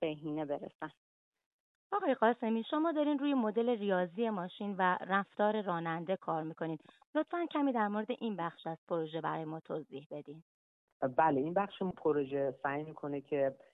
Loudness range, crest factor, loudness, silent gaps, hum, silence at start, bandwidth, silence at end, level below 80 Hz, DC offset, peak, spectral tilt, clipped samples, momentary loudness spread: 4 LU; 20 dB; -35 LUFS; 0.75-0.79 s, 0.97-1.32 s, 1.46-1.90 s, 7.06-7.13 s, 8.78-8.87 s, 10.06-10.10 s, 10.42-11.00 s; none; 0 s; 4 kHz; 0.2 s; -80 dBFS; under 0.1%; -14 dBFS; -9 dB/octave; under 0.1%; 11 LU